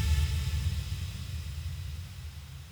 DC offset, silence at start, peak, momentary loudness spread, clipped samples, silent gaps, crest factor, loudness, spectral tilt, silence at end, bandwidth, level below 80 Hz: under 0.1%; 0 s; -18 dBFS; 14 LU; under 0.1%; none; 16 dB; -35 LUFS; -4.5 dB/octave; 0 s; over 20 kHz; -36 dBFS